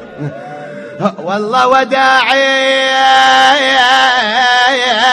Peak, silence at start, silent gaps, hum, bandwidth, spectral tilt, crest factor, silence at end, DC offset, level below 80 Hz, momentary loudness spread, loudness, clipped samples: 0 dBFS; 0 s; none; none; 12 kHz; -2.5 dB/octave; 10 dB; 0 s; under 0.1%; -54 dBFS; 17 LU; -9 LUFS; 0.3%